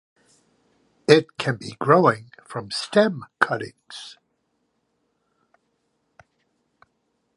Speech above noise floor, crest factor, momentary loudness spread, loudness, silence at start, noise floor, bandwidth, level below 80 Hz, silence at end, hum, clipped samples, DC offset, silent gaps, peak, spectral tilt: 51 dB; 24 dB; 20 LU; -21 LUFS; 1.1 s; -72 dBFS; 11.5 kHz; -68 dBFS; 3.25 s; none; under 0.1%; under 0.1%; none; 0 dBFS; -5.5 dB/octave